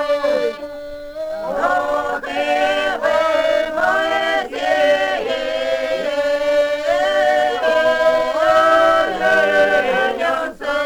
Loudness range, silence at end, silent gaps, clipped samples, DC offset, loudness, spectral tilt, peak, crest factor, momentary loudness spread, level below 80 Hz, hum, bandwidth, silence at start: 4 LU; 0 s; none; under 0.1%; under 0.1%; -17 LUFS; -3 dB/octave; -4 dBFS; 12 dB; 8 LU; -48 dBFS; none; 19 kHz; 0 s